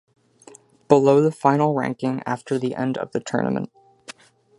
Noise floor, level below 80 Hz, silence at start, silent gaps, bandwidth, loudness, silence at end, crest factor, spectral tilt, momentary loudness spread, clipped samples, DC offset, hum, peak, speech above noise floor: -49 dBFS; -66 dBFS; 0.9 s; none; 11.5 kHz; -21 LUFS; 0.45 s; 22 dB; -7 dB/octave; 17 LU; under 0.1%; under 0.1%; none; -2 dBFS; 29 dB